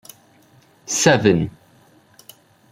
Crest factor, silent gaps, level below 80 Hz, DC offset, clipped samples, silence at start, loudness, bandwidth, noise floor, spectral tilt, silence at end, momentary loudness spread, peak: 20 dB; none; -54 dBFS; under 0.1%; under 0.1%; 0.9 s; -17 LUFS; 16.5 kHz; -53 dBFS; -4 dB/octave; 1.2 s; 16 LU; -2 dBFS